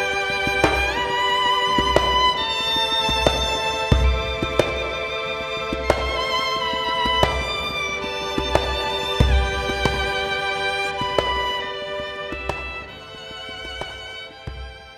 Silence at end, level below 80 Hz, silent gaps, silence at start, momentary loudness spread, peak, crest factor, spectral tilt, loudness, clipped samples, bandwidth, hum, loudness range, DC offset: 0 s; -30 dBFS; none; 0 s; 13 LU; -2 dBFS; 22 dB; -4 dB/octave; -21 LUFS; under 0.1%; 14 kHz; none; 7 LU; under 0.1%